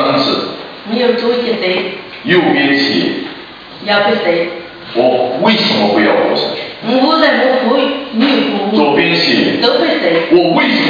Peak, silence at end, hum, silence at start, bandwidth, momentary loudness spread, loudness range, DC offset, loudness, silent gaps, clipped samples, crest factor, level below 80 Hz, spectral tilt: 0 dBFS; 0 s; none; 0 s; 5.2 kHz; 11 LU; 3 LU; under 0.1%; -12 LUFS; none; under 0.1%; 12 dB; -56 dBFS; -6 dB/octave